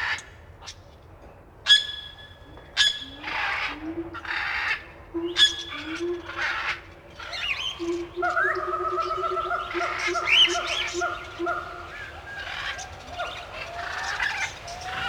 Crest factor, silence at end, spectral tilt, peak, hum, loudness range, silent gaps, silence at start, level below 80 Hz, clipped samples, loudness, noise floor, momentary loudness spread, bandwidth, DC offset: 22 dB; 0 s; -1.5 dB/octave; -6 dBFS; none; 8 LU; none; 0 s; -52 dBFS; under 0.1%; -25 LUFS; -48 dBFS; 18 LU; 18.5 kHz; under 0.1%